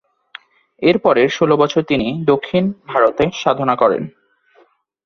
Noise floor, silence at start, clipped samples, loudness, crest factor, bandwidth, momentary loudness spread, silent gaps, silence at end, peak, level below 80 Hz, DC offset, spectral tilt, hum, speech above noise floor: -54 dBFS; 0.8 s; under 0.1%; -16 LUFS; 16 dB; 7 kHz; 5 LU; none; 0.95 s; 0 dBFS; -50 dBFS; under 0.1%; -6.5 dB/octave; none; 39 dB